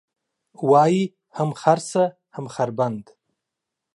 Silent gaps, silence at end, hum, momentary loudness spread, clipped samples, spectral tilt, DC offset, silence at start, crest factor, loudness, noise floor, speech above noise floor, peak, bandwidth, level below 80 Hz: none; 0.9 s; none; 14 LU; under 0.1%; -6.5 dB/octave; under 0.1%; 0.6 s; 20 dB; -21 LUFS; -83 dBFS; 63 dB; -2 dBFS; 11.5 kHz; -72 dBFS